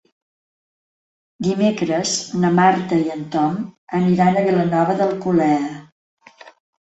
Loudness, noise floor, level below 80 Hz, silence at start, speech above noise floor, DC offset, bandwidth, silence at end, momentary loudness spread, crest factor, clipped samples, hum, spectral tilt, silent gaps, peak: -18 LUFS; under -90 dBFS; -58 dBFS; 1.4 s; over 72 dB; under 0.1%; 8.2 kHz; 0.35 s; 8 LU; 16 dB; under 0.1%; none; -5.5 dB/octave; 3.78-3.87 s, 5.92-6.17 s; -4 dBFS